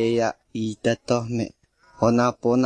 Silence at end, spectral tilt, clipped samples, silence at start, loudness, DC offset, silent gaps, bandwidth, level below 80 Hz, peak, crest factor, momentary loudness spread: 0 s; -6 dB/octave; under 0.1%; 0 s; -24 LUFS; under 0.1%; none; 9.8 kHz; -56 dBFS; -6 dBFS; 18 dB; 10 LU